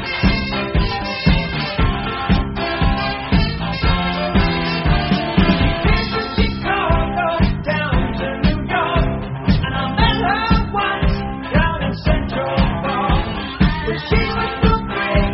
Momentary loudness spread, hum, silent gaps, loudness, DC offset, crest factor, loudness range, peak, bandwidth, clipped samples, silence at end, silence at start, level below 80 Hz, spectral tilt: 4 LU; none; none; -18 LUFS; under 0.1%; 16 dB; 1 LU; -2 dBFS; 6 kHz; under 0.1%; 0 s; 0 s; -22 dBFS; -4.5 dB/octave